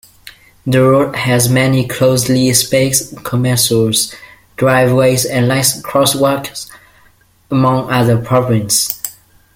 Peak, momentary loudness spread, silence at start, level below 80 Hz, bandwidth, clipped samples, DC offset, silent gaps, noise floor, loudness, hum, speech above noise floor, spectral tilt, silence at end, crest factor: 0 dBFS; 9 LU; 0.25 s; -46 dBFS; 17 kHz; under 0.1%; under 0.1%; none; -50 dBFS; -13 LUFS; none; 37 dB; -4.5 dB/octave; 0.45 s; 14 dB